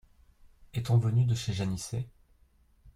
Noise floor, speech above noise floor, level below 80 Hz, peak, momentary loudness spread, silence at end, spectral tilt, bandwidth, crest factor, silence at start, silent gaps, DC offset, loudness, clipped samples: -64 dBFS; 36 dB; -56 dBFS; -14 dBFS; 13 LU; 0.05 s; -6 dB/octave; 12.5 kHz; 16 dB; 0.75 s; none; under 0.1%; -30 LUFS; under 0.1%